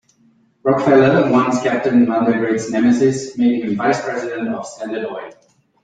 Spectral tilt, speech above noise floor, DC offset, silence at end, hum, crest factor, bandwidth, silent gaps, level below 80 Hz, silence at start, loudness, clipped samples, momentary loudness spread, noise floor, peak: -6.5 dB/octave; 40 dB; under 0.1%; 0.5 s; none; 16 dB; 9.2 kHz; none; -58 dBFS; 0.65 s; -16 LUFS; under 0.1%; 13 LU; -56 dBFS; -2 dBFS